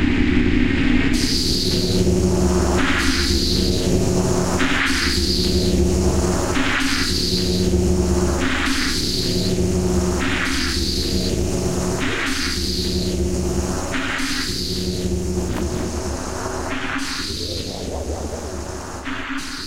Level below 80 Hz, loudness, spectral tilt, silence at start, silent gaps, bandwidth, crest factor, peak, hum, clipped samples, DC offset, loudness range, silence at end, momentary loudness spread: -26 dBFS; -20 LUFS; -4.5 dB/octave; 0 s; none; 16 kHz; 18 dB; -2 dBFS; none; under 0.1%; 0.2%; 6 LU; 0 s; 8 LU